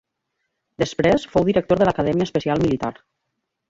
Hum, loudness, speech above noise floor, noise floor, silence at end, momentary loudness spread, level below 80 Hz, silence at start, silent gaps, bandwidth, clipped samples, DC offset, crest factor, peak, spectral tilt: none; -20 LUFS; 58 dB; -78 dBFS; 0.8 s; 8 LU; -46 dBFS; 0.8 s; none; 7.8 kHz; under 0.1%; under 0.1%; 18 dB; -4 dBFS; -6.5 dB/octave